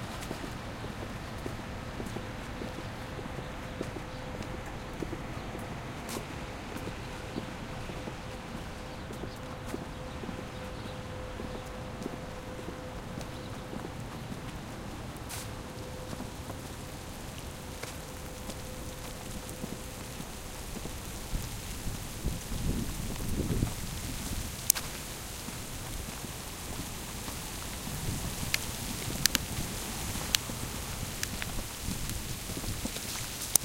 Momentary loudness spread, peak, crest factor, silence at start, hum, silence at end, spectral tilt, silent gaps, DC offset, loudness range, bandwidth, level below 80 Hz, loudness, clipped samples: 9 LU; 0 dBFS; 38 dB; 0 s; none; 0 s; -3.5 dB/octave; none; under 0.1%; 8 LU; 17 kHz; -44 dBFS; -37 LUFS; under 0.1%